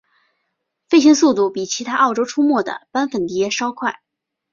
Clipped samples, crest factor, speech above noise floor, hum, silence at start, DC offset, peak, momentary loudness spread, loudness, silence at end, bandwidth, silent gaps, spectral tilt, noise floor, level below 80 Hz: under 0.1%; 16 dB; 57 dB; none; 0.9 s; under 0.1%; -2 dBFS; 11 LU; -17 LUFS; 0.6 s; 7.4 kHz; none; -3.5 dB/octave; -74 dBFS; -64 dBFS